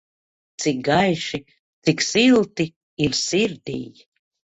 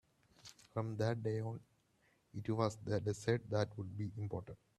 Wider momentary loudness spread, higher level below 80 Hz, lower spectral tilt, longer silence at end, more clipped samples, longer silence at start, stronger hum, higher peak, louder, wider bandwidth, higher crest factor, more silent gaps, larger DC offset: about the same, 15 LU vs 15 LU; first, -54 dBFS vs -70 dBFS; second, -4 dB/octave vs -7 dB/octave; first, 0.6 s vs 0.25 s; neither; first, 0.6 s vs 0.45 s; neither; first, -4 dBFS vs -20 dBFS; first, -21 LUFS vs -40 LUFS; second, 8.4 kHz vs 12 kHz; about the same, 18 dB vs 20 dB; first, 1.59-1.82 s, 2.76-2.97 s vs none; neither